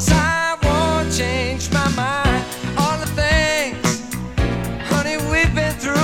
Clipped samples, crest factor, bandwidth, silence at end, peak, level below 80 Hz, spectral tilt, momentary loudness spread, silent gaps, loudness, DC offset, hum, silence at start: under 0.1%; 18 dB; 17.5 kHz; 0 s; 0 dBFS; -28 dBFS; -4.5 dB/octave; 6 LU; none; -19 LUFS; under 0.1%; none; 0 s